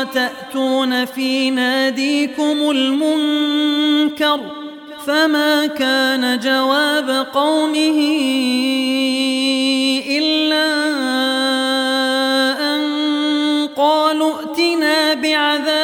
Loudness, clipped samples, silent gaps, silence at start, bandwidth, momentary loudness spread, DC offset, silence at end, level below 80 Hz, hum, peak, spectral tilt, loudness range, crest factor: -16 LUFS; under 0.1%; none; 0 s; 17 kHz; 4 LU; under 0.1%; 0 s; -68 dBFS; none; -2 dBFS; -2 dB/octave; 1 LU; 14 dB